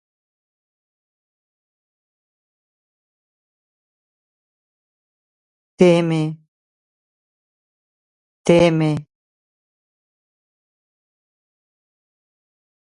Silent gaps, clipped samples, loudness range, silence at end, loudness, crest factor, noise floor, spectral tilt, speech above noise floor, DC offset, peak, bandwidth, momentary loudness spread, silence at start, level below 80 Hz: 6.48-8.45 s; under 0.1%; 2 LU; 3.85 s; -17 LUFS; 24 dB; under -90 dBFS; -7 dB/octave; over 75 dB; under 0.1%; 0 dBFS; 11 kHz; 11 LU; 5.8 s; -58 dBFS